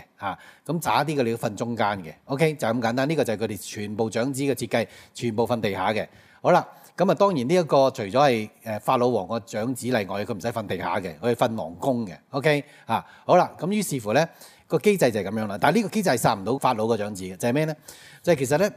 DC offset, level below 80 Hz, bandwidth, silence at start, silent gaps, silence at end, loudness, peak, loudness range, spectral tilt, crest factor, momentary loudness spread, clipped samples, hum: under 0.1%; -66 dBFS; 16 kHz; 0.2 s; none; 0 s; -24 LUFS; -4 dBFS; 4 LU; -5.5 dB/octave; 20 dB; 10 LU; under 0.1%; none